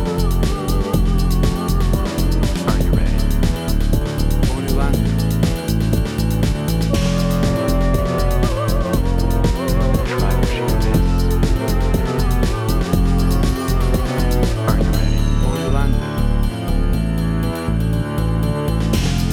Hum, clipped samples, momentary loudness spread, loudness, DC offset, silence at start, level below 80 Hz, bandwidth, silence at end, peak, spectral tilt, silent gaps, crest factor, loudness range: none; under 0.1%; 2 LU; -19 LUFS; under 0.1%; 0 s; -18 dBFS; 17.5 kHz; 0 s; -2 dBFS; -6.5 dB/octave; none; 14 dB; 1 LU